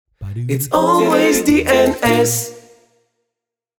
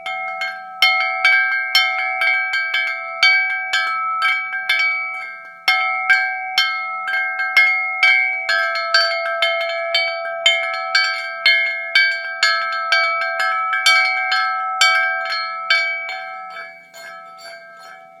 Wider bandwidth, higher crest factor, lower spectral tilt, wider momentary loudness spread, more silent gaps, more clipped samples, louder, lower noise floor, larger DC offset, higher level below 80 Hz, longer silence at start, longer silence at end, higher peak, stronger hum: first, over 20 kHz vs 16 kHz; about the same, 16 dB vs 18 dB; first, -4.5 dB/octave vs 3 dB/octave; about the same, 12 LU vs 12 LU; neither; neither; about the same, -14 LUFS vs -16 LUFS; first, -82 dBFS vs -40 dBFS; neither; first, -44 dBFS vs -78 dBFS; first, 0.2 s vs 0 s; first, 1.2 s vs 0.1 s; about the same, 0 dBFS vs 0 dBFS; neither